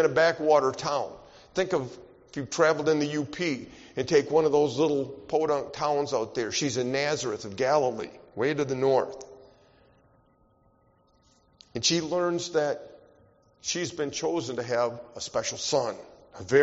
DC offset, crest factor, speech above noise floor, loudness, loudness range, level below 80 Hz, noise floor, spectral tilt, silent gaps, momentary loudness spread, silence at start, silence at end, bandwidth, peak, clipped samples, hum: under 0.1%; 20 dB; 38 dB; -27 LUFS; 6 LU; -64 dBFS; -64 dBFS; -3.5 dB/octave; none; 14 LU; 0 s; 0 s; 8 kHz; -8 dBFS; under 0.1%; none